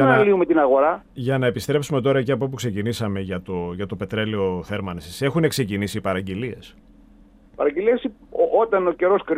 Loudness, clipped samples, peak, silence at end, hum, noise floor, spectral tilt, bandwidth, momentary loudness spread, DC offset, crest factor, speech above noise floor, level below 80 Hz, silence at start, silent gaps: -22 LUFS; under 0.1%; -4 dBFS; 0 s; none; -50 dBFS; -6.5 dB/octave; 15.5 kHz; 12 LU; under 0.1%; 18 dB; 29 dB; -52 dBFS; 0 s; none